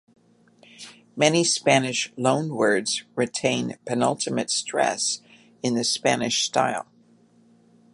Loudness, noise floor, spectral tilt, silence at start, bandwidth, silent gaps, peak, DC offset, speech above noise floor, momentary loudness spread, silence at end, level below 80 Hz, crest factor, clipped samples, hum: -23 LUFS; -57 dBFS; -3 dB/octave; 0.8 s; 11.5 kHz; none; -2 dBFS; under 0.1%; 34 dB; 11 LU; 1.1 s; -70 dBFS; 22 dB; under 0.1%; none